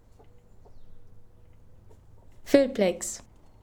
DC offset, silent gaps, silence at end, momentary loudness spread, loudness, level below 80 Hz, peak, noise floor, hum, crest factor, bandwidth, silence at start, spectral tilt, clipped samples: under 0.1%; none; 0.45 s; 19 LU; -25 LUFS; -54 dBFS; -6 dBFS; -53 dBFS; none; 24 dB; 20 kHz; 0.25 s; -4.5 dB/octave; under 0.1%